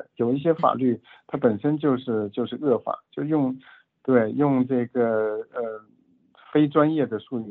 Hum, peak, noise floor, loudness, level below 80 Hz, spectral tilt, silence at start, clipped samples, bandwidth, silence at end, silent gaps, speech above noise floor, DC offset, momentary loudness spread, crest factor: none; -6 dBFS; -59 dBFS; -24 LUFS; -70 dBFS; -11 dB/octave; 0 s; under 0.1%; 4.2 kHz; 0 s; none; 36 dB; under 0.1%; 11 LU; 18 dB